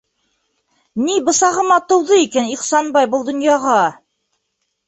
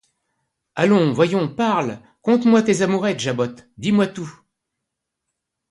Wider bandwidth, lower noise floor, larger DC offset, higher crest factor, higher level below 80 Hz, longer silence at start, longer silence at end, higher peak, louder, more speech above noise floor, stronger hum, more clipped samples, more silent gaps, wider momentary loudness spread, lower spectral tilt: second, 8.4 kHz vs 11.5 kHz; second, -72 dBFS vs -80 dBFS; neither; about the same, 16 dB vs 18 dB; about the same, -62 dBFS vs -62 dBFS; first, 0.95 s vs 0.75 s; second, 0.95 s vs 1.4 s; about the same, -2 dBFS vs -4 dBFS; first, -15 LUFS vs -19 LUFS; second, 57 dB vs 62 dB; neither; neither; neither; second, 6 LU vs 12 LU; second, -2.5 dB/octave vs -6 dB/octave